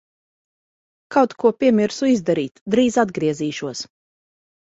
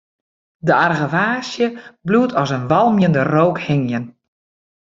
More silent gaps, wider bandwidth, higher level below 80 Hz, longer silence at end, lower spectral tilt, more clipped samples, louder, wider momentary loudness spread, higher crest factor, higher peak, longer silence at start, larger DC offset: first, 2.51-2.55 s, 2.61-2.66 s vs none; about the same, 8 kHz vs 7.6 kHz; about the same, -60 dBFS vs -56 dBFS; about the same, 0.85 s vs 0.85 s; second, -5.5 dB/octave vs -7 dB/octave; neither; second, -20 LUFS vs -17 LUFS; about the same, 11 LU vs 9 LU; about the same, 18 dB vs 16 dB; about the same, -2 dBFS vs -2 dBFS; first, 1.1 s vs 0.65 s; neither